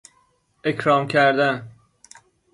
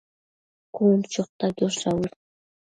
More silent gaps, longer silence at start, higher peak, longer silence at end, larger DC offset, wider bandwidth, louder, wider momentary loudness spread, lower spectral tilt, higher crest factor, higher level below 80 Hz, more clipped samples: second, none vs 1.29-1.39 s; about the same, 0.65 s vs 0.75 s; about the same, -6 dBFS vs -8 dBFS; first, 0.85 s vs 0.65 s; neither; first, 11.5 kHz vs 9.4 kHz; first, -20 LUFS vs -24 LUFS; about the same, 11 LU vs 10 LU; about the same, -5.5 dB/octave vs -5.5 dB/octave; about the same, 18 dB vs 18 dB; about the same, -64 dBFS vs -60 dBFS; neither